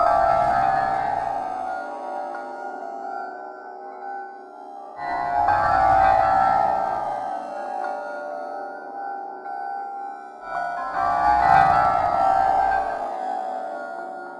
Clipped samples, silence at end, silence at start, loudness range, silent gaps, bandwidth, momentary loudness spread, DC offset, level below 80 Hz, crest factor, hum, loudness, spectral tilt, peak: under 0.1%; 0 s; 0 s; 11 LU; none; 10.5 kHz; 17 LU; under 0.1%; -48 dBFS; 20 dB; none; -23 LUFS; -5.5 dB/octave; -4 dBFS